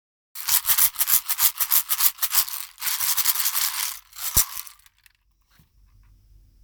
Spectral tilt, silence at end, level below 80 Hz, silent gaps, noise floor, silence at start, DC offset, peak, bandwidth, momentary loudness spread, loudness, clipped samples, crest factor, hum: 1.5 dB/octave; 1.95 s; -50 dBFS; none; -63 dBFS; 0.35 s; under 0.1%; 0 dBFS; over 20 kHz; 11 LU; -20 LUFS; under 0.1%; 24 dB; none